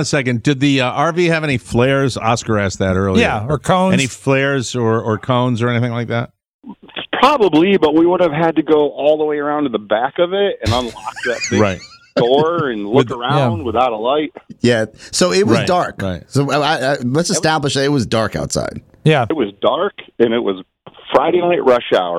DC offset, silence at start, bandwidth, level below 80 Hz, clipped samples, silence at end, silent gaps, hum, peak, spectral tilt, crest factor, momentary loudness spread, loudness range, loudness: under 0.1%; 0 s; 14.5 kHz; -44 dBFS; under 0.1%; 0 s; 6.54-6.59 s; none; 0 dBFS; -5.5 dB/octave; 16 dB; 7 LU; 3 LU; -16 LUFS